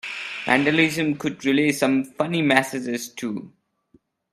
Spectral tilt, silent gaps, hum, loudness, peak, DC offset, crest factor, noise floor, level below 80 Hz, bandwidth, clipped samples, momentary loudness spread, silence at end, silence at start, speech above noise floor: -4.5 dB/octave; none; none; -22 LUFS; 0 dBFS; under 0.1%; 22 dB; -61 dBFS; -66 dBFS; 14.5 kHz; under 0.1%; 11 LU; 0.85 s; 0.05 s; 39 dB